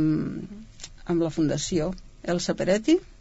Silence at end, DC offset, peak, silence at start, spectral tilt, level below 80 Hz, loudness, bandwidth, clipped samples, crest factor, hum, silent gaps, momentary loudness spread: 0.05 s; under 0.1%; -10 dBFS; 0 s; -5.5 dB/octave; -46 dBFS; -26 LUFS; 8 kHz; under 0.1%; 16 dB; none; none; 18 LU